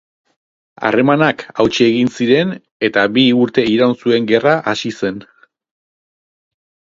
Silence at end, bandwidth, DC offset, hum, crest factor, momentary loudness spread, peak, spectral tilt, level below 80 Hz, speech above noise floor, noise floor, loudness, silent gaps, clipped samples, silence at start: 1.75 s; 7.6 kHz; under 0.1%; none; 16 dB; 9 LU; 0 dBFS; -5.5 dB/octave; -54 dBFS; over 76 dB; under -90 dBFS; -14 LUFS; 2.71-2.80 s; under 0.1%; 0.8 s